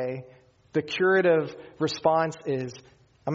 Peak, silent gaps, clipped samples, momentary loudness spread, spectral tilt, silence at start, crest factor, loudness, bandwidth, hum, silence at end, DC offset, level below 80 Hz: -8 dBFS; none; under 0.1%; 16 LU; -4 dB/octave; 0 s; 18 dB; -25 LUFS; 7.6 kHz; none; 0 s; under 0.1%; -68 dBFS